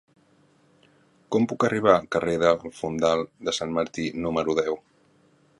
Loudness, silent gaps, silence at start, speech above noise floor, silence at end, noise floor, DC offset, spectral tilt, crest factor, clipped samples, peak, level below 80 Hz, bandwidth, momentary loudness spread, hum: -25 LUFS; none; 1.3 s; 37 dB; 0.8 s; -61 dBFS; under 0.1%; -5 dB/octave; 24 dB; under 0.1%; -2 dBFS; -56 dBFS; 11.5 kHz; 8 LU; none